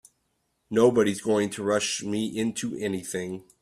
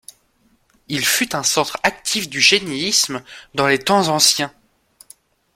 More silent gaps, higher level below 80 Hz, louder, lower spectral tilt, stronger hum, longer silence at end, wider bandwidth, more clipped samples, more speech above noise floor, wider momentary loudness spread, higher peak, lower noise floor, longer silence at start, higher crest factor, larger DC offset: neither; second, -64 dBFS vs -58 dBFS; second, -26 LUFS vs -16 LUFS; first, -4.5 dB/octave vs -1.5 dB/octave; neither; second, 0.2 s vs 1.05 s; about the same, 15 kHz vs 16.5 kHz; neither; first, 49 dB vs 42 dB; about the same, 10 LU vs 10 LU; second, -8 dBFS vs 0 dBFS; first, -74 dBFS vs -60 dBFS; second, 0.7 s vs 0.9 s; about the same, 18 dB vs 20 dB; neither